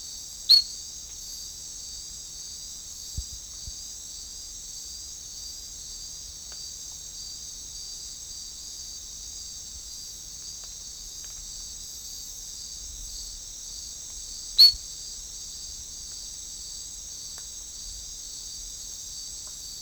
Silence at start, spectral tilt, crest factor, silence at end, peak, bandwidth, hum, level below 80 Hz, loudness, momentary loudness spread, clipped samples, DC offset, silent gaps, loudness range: 0 s; 1 dB/octave; 26 dB; 0 s; -6 dBFS; over 20 kHz; none; -50 dBFS; -29 LUFS; 3 LU; under 0.1%; under 0.1%; none; 13 LU